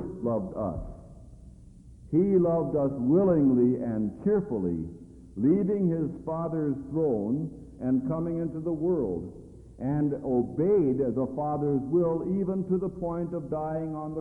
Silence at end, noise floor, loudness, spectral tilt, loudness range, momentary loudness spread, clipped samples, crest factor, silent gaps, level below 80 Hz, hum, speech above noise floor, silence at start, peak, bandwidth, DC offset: 0 s; -50 dBFS; -28 LUFS; -12 dB/octave; 4 LU; 11 LU; under 0.1%; 16 dB; none; -52 dBFS; none; 23 dB; 0 s; -12 dBFS; 2.6 kHz; under 0.1%